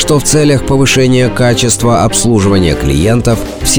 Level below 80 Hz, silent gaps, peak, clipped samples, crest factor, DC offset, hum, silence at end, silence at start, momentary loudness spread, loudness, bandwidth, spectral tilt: -24 dBFS; none; 0 dBFS; under 0.1%; 10 dB; 3%; none; 0 s; 0 s; 3 LU; -9 LUFS; over 20 kHz; -4.5 dB/octave